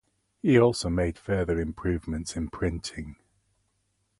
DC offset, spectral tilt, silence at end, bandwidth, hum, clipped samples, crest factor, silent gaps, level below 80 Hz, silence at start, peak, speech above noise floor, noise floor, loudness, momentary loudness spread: under 0.1%; -6 dB/octave; 1.05 s; 11.5 kHz; none; under 0.1%; 20 dB; none; -42 dBFS; 0.45 s; -8 dBFS; 48 dB; -74 dBFS; -27 LUFS; 15 LU